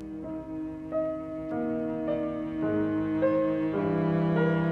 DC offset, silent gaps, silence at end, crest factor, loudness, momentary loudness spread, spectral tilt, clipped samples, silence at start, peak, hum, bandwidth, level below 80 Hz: under 0.1%; none; 0 s; 14 dB; -29 LUFS; 11 LU; -10 dB/octave; under 0.1%; 0 s; -14 dBFS; none; 4.6 kHz; -56 dBFS